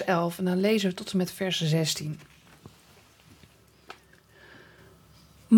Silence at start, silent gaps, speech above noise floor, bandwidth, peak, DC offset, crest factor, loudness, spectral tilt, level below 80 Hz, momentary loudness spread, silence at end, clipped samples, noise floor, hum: 0 s; none; 30 dB; 19 kHz; -8 dBFS; under 0.1%; 20 dB; -27 LUFS; -5 dB/octave; -66 dBFS; 24 LU; 0 s; under 0.1%; -57 dBFS; none